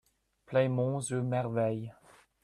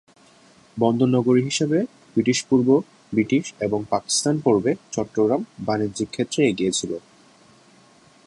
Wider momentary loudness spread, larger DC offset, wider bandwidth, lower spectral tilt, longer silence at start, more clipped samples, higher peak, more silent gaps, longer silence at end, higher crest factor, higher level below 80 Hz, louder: about the same, 7 LU vs 8 LU; neither; about the same, 12 kHz vs 11.5 kHz; first, -6.5 dB/octave vs -5 dB/octave; second, 0.5 s vs 0.75 s; neither; second, -16 dBFS vs -6 dBFS; neither; second, 0.5 s vs 1.25 s; about the same, 18 dB vs 18 dB; second, -68 dBFS vs -60 dBFS; second, -32 LUFS vs -22 LUFS